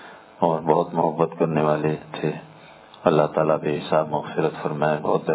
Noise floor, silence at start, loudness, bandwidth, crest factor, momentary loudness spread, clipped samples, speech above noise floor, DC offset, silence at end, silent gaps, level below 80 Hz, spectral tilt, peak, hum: -46 dBFS; 0 s; -23 LUFS; 4 kHz; 20 dB; 7 LU; under 0.1%; 24 dB; under 0.1%; 0 s; none; -60 dBFS; -11 dB/octave; -2 dBFS; none